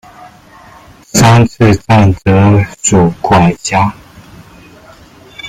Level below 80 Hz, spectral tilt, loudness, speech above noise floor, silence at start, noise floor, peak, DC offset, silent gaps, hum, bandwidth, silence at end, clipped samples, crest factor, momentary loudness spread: -36 dBFS; -5.5 dB/octave; -9 LUFS; 30 dB; 0.2 s; -38 dBFS; 0 dBFS; under 0.1%; none; none; 15.5 kHz; 0 s; under 0.1%; 10 dB; 6 LU